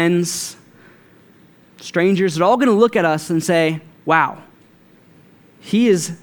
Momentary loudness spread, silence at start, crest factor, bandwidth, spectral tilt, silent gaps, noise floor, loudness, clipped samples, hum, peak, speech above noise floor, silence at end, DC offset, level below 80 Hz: 11 LU; 0 s; 18 dB; 19 kHz; -5 dB/octave; none; -50 dBFS; -17 LUFS; under 0.1%; none; 0 dBFS; 34 dB; 0.05 s; under 0.1%; -68 dBFS